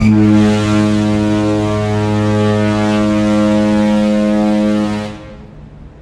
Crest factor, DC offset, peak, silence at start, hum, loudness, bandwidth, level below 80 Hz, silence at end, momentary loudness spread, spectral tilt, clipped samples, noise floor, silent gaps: 12 dB; under 0.1%; 0 dBFS; 0 s; none; -13 LUFS; 11 kHz; -34 dBFS; 0 s; 5 LU; -7 dB/octave; under 0.1%; -34 dBFS; none